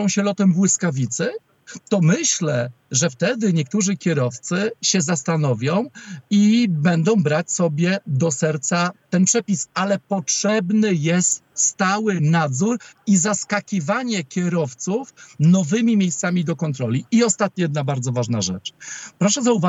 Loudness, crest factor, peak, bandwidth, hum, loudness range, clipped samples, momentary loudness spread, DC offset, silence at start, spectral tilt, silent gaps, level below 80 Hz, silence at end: -20 LUFS; 14 dB; -4 dBFS; 8.4 kHz; none; 2 LU; under 0.1%; 7 LU; under 0.1%; 0 s; -4.5 dB/octave; none; -70 dBFS; 0 s